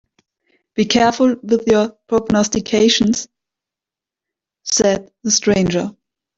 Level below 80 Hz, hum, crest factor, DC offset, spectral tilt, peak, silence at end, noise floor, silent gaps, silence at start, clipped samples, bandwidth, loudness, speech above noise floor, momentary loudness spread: -48 dBFS; none; 18 dB; under 0.1%; -3.5 dB/octave; 0 dBFS; 0.45 s; -88 dBFS; none; 0.75 s; under 0.1%; 8 kHz; -16 LUFS; 72 dB; 9 LU